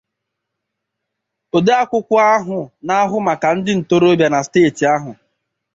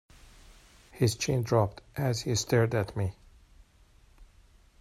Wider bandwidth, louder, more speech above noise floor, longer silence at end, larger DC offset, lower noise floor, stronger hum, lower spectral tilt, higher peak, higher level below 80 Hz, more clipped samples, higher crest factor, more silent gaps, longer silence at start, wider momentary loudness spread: second, 7.8 kHz vs 13.5 kHz; first, -15 LUFS vs -29 LUFS; first, 63 dB vs 32 dB; about the same, 0.65 s vs 0.55 s; neither; first, -78 dBFS vs -60 dBFS; neither; about the same, -5.5 dB/octave vs -5.5 dB/octave; first, -2 dBFS vs -10 dBFS; about the same, -58 dBFS vs -56 dBFS; neither; second, 14 dB vs 22 dB; neither; first, 1.55 s vs 0.95 s; about the same, 7 LU vs 7 LU